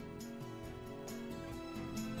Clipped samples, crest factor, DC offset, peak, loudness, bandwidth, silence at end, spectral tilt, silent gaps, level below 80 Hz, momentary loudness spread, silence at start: under 0.1%; 14 dB; under 0.1%; -32 dBFS; -46 LUFS; over 20 kHz; 0 s; -5.5 dB/octave; none; -60 dBFS; 5 LU; 0 s